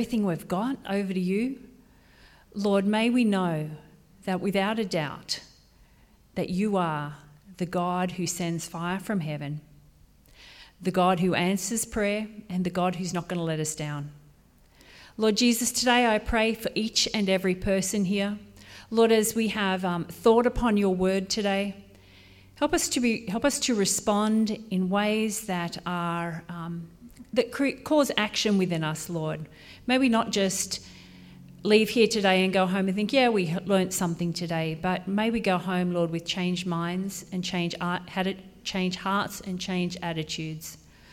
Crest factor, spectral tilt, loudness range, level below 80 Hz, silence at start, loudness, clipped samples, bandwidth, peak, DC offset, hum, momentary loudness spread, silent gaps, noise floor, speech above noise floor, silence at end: 20 dB; -4.5 dB/octave; 6 LU; -52 dBFS; 0 s; -26 LUFS; under 0.1%; 16.5 kHz; -8 dBFS; under 0.1%; none; 12 LU; none; -58 dBFS; 32 dB; 0.35 s